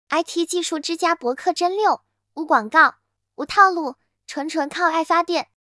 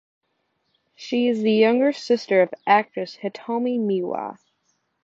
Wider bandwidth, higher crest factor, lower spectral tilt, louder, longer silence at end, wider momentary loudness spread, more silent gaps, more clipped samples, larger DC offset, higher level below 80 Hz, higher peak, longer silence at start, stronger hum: first, 12 kHz vs 7.6 kHz; about the same, 20 dB vs 18 dB; second, -1.5 dB/octave vs -6 dB/octave; about the same, -20 LUFS vs -22 LUFS; second, 0.25 s vs 0.7 s; about the same, 14 LU vs 13 LU; neither; neither; neither; first, -66 dBFS vs -76 dBFS; first, 0 dBFS vs -4 dBFS; second, 0.1 s vs 1 s; neither